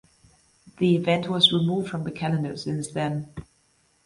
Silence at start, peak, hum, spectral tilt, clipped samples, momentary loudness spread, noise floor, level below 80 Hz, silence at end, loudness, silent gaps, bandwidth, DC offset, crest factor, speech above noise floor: 0.65 s; -6 dBFS; none; -5.5 dB/octave; under 0.1%; 13 LU; -65 dBFS; -58 dBFS; 0.65 s; -24 LUFS; none; 11.5 kHz; under 0.1%; 20 dB; 41 dB